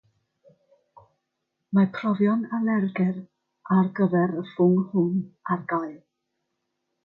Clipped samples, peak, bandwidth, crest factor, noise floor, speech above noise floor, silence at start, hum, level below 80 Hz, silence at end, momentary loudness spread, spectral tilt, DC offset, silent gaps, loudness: under 0.1%; -10 dBFS; 4.3 kHz; 16 dB; -80 dBFS; 57 dB; 1.7 s; none; -72 dBFS; 1.1 s; 8 LU; -11 dB/octave; under 0.1%; none; -24 LUFS